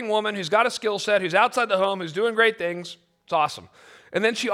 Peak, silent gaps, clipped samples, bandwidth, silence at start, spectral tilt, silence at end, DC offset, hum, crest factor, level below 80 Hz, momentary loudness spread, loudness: -6 dBFS; none; under 0.1%; 14.5 kHz; 0 s; -3.5 dB/octave; 0 s; under 0.1%; none; 18 dB; -72 dBFS; 10 LU; -23 LUFS